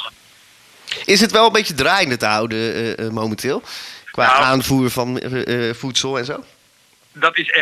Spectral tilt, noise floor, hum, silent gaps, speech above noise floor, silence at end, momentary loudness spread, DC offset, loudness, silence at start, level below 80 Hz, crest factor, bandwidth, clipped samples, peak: -3.5 dB/octave; -54 dBFS; none; none; 37 dB; 0 s; 15 LU; under 0.1%; -17 LUFS; 0 s; -52 dBFS; 18 dB; 15.5 kHz; under 0.1%; -2 dBFS